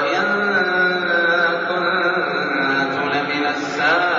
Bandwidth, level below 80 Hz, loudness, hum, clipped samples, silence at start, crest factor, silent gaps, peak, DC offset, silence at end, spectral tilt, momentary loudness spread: 7.4 kHz; -66 dBFS; -18 LUFS; none; under 0.1%; 0 s; 12 dB; none; -6 dBFS; under 0.1%; 0 s; -1.5 dB/octave; 4 LU